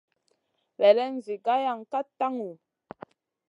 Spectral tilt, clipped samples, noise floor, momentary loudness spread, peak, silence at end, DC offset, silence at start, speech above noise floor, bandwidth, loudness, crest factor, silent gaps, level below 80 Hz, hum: -5.5 dB/octave; under 0.1%; -74 dBFS; 24 LU; -6 dBFS; 0.95 s; under 0.1%; 0.8 s; 49 dB; 7.4 kHz; -26 LUFS; 22 dB; none; -82 dBFS; none